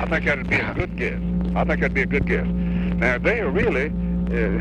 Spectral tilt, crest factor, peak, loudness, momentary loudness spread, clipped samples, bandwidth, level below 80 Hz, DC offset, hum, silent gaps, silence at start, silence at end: -8 dB/octave; 16 dB; -4 dBFS; -22 LUFS; 4 LU; under 0.1%; 7 kHz; -30 dBFS; under 0.1%; none; none; 0 s; 0 s